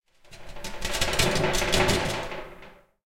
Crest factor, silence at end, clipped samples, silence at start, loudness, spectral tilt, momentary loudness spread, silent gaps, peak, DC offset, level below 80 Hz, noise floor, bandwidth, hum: 20 dB; 0.3 s; under 0.1%; 0.3 s; -25 LUFS; -3 dB/octave; 17 LU; none; -6 dBFS; under 0.1%; -38 dBFS; -49 dBFS; 17 kHz; none